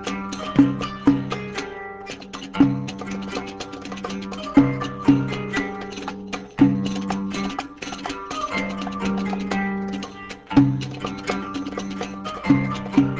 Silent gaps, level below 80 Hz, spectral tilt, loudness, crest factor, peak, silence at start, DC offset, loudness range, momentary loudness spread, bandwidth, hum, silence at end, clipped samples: none; -48 dBFS; -6.5 dB/octave; -24 LUFS; 20 dB; -2 dBFS; 0 s; under 0.1%; 4 LU; 13 LU; 8 kHz; none; 0 s; under 0.1%